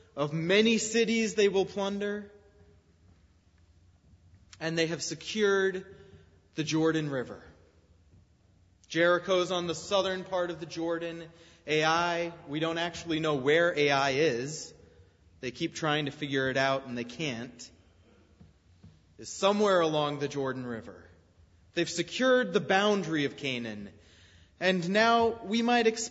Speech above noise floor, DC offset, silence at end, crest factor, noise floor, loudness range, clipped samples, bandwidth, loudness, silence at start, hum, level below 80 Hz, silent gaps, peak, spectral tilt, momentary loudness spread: 35 dB; under 0.1%; 0 s; 20 dB; -63 dBFS; 6 LU; under 0.1%; 8 kHz; -29 LUFS; 0.15 s; none; -66 dBFS; none; -10 dBFS; -4 dB/octave; 15 LU